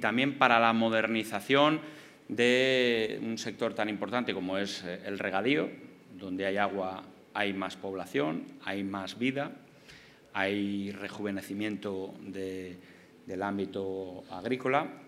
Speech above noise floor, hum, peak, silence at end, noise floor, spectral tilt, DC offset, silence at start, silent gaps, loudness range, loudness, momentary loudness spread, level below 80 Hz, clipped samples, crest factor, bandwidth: 24 dB; none; -6 dBFS; 0 s; -55 dBFS; -5 dB/octave; under 0.1%; 0 s; none; 9 LU; -31 LUFS; 15 LU; -78 dBFS; under 0.1%; 26 dB; 15.5 kHz